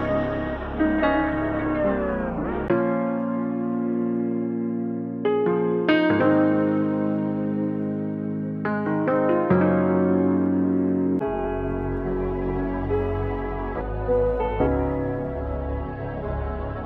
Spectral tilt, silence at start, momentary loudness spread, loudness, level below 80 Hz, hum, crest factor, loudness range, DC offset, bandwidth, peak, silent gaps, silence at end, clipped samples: -10 dB/octave; 0 s; 9 LU; -24 LUFS; -36 dBFS; none; 16 dB; 4 LU; under 0.1%; 5.2 kHz; -6 dBFS; none; 0 s; under 0.1%